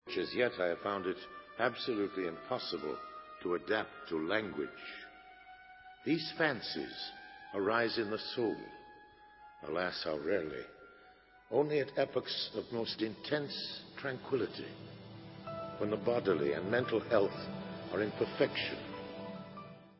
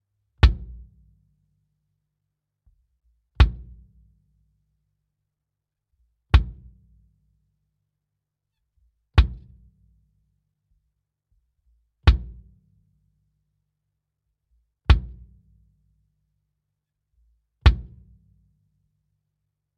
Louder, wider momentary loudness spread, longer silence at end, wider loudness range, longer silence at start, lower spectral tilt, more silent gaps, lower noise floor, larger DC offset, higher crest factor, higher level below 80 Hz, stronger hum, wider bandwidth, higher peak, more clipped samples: second, -36 LUFS vs -23 LUFS; second, 17 LU vs 22 LU; second, 0.05 s vs 1.95 s; first, 4 LU vs 1 LU; second, 0.05 s vs 0.45 s; first, -8.5 dB/octave vs -5 dB/octave; neither; second, -61 dBFS vs -84 dBFS; neither; about the same, 22 dB vs 24 dB; second, -70 dBFS vs -30 dBFS; neither; second, 5.8 kHz vs 6.4 kHz; second, -16 dBFS vs -4 dBFS; neither